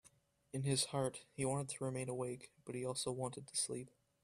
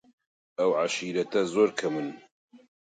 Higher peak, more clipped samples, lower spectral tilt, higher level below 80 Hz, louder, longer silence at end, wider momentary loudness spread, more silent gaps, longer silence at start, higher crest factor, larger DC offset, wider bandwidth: second, -22 dBFS vs -10 dBFS; neither; about the same, -4 dB/octave vs -4.5 dB/octave; about the same, -74 dBFS vs -76 dBFS; second, -41 LUFS vs -27 LUFS; about the same, 0.35 s vs 0.3 s; about the same, 12 LU vs 10 LU; second, none vs 2.32-2.48 s; about the same, 0.55 s vs 0.6 s; about the same, 20 dB vs 18 dB; neither; first, 14.5 kHz vs 9.2 kHz